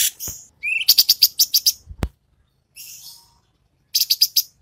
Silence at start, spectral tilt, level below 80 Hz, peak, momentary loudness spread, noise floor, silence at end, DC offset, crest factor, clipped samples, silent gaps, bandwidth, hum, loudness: 0 s; 1 dB/octave; -42 dBFS; -2 dBFS; 23 LU; -64 dBFS; 0.15 s; under 0.1%; 20 dB; under 0.1%; none; 16.5 kHz; none; -15 LUFS